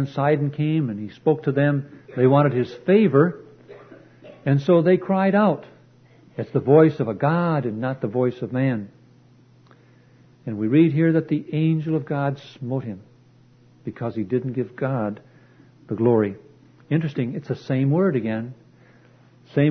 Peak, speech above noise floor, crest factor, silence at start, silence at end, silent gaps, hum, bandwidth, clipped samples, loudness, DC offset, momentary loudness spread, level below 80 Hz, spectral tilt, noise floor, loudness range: -2 dBFS; 33 dB; 20 dB; 0 s; 0 s; none; none; 6.2 kHz; under 0.1%; -21 LUFS; under 0.1%; 15 LU; -64 dBFS; -10 dB/octave; -53 dBFS; 7 LU